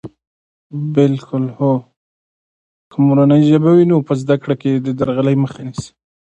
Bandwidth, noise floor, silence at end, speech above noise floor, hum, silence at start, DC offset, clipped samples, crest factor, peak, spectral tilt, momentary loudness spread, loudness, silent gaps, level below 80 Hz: 9 kHz; under -90 dBFS; 0.45 s; over 76 dB; none; 0.05 s; under 0.1%; under 0.1%; 16 dB; 0 dBFS; -8.5 dB/octave; 16 LU; -15 LUFS; 0.27-0.70 s, 1.96-2.91 s; -54 dBFS